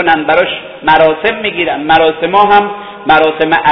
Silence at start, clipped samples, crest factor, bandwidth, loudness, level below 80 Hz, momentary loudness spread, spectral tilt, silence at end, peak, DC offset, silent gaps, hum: 0 s; 0.7%; 10 dB; 5.4 kHz; -10 LUFS; -42 dBFS; 8 LU; -7 dB/octave; 0 s; 0 dBFS; 0.5%; none; none